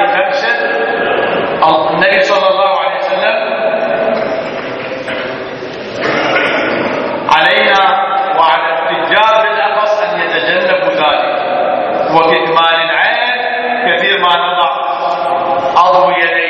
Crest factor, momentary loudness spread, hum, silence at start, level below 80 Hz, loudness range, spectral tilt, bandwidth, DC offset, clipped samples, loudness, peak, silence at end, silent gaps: 12 dB; 7 LU; none; 0 s; -54 dBFS; 5 LU; -4 dB/octave; 8.4 kHz; under 0.1%; under 0.1%; -11 LUFS; 0 dBFS; 0 s; none